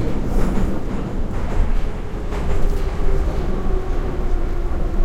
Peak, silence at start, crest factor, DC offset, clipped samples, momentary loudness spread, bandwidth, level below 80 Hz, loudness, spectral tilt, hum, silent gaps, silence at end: -4 dBFS; 0 s; 14 dB; under 0.1%; under 0.1%; 4 LU; 8 kHz; -20 dBFS; -25 LUFS; -7.5 dB/octave; none; none; 0 s